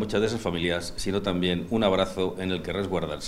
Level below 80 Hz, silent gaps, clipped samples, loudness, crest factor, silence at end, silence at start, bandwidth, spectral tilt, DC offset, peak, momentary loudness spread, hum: -46 dBFS; none; under 0.1%; -27 LUFS; 18 dB; 0 s; 0 s; 15.5 kHz; -5.5 dB/octave; under 0.1%; -8 dBFS; 5 LU; none